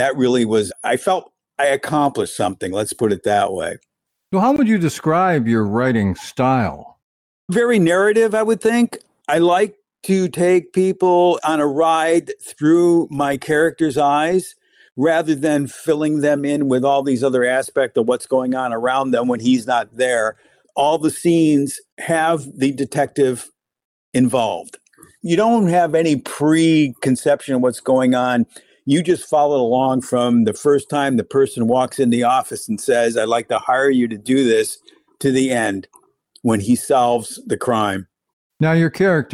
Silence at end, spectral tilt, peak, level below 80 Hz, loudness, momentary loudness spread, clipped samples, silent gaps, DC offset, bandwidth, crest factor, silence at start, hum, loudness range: 0 s; -5.5 dB/octave; -6 dBFS; -58 dBFS; -17 LUFS; 8 LU; under 0.1%; 7.02-7.48 s, 21.92-21.97 s, 23.85-24.12 s, 38.33-38.50 s; under 0.1%; 15.5 kHz; 12 dB; 0 s; none; 3 LU